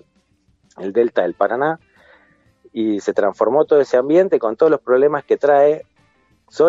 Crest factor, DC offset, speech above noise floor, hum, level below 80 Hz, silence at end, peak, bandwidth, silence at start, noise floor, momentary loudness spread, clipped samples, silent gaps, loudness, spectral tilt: 16 dB; under 0.1%; 45 dB; none; -68 dBFS; 0 s; -2 dBFS; 7.8 kHz; 0.8 s; -60 dBFS; 10 LU; under 0.1%; none; -17 LUFS; -6.5 dB/octave